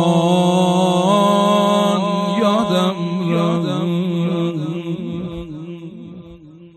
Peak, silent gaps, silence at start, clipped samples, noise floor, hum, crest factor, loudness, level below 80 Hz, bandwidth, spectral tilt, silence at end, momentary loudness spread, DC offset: -2 dBFS; none; 0 s; under 0.1%; -40 dBFS; none; 14 dB; -17 LUFS; -52 dBFS; 12.5 kHz; -6.5 dB/octave; 0.1 s; 17 LU; under 0.1%